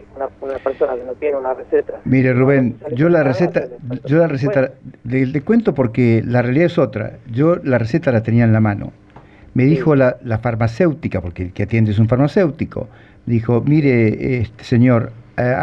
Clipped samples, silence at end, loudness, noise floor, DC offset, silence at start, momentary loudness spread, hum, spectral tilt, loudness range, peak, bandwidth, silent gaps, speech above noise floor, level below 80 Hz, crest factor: under 0.1%; 0 s; -17 LUFS; -42 dBFS; under 0.1%; 0.15 s; 11 LU; none; -9.5 dB/octave; 2 LU; -2 dBFS; 6.6 kHz; none; 27 dB; -44 dBFS; 14 dB